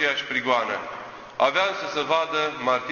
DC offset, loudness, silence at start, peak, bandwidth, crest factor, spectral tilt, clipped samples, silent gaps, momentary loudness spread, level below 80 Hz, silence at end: under 0.1%; -24 LUFS; 0 s; -6 dBFS; 7.2 kHz; 18 dB; -3 dB/octave; under 0.1%; none; 12 LU; -64 dBFS; 0 s